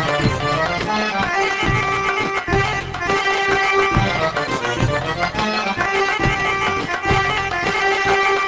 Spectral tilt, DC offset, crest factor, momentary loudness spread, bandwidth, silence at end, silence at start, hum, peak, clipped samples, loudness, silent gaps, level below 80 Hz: -4.5 dB/octave; under 0.1%; 16 dB; 4 LU; 8 kHz; 0 s; 0 s; none; -2 dBFS; under 0.1%; -18 LUFS; none; -36 dBFS